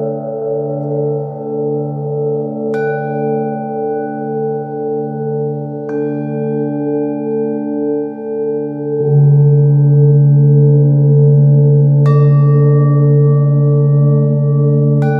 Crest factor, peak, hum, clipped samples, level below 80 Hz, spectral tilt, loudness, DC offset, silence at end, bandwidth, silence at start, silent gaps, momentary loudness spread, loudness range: 12 dB; 0 dBFS; none; under 0.1%; -60 dBFS; -13 dB/octave; -13 LUFS; under 0.1%; 0 s; 2.5 kHz; 0 s; none; 11 LU; 9 LU